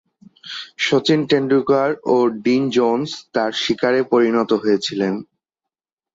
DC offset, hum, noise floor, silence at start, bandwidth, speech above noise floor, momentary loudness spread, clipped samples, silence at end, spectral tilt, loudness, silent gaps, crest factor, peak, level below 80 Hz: under 0.1%; none; -86 dBFS; 0.45 s; 8 kHz; 69 dB; 7 LU; under 0.1%; 0.9 s; -5.5 dB/octave; -18 LUFS; none; 16 dB; -4 dBFS; -62 dBFS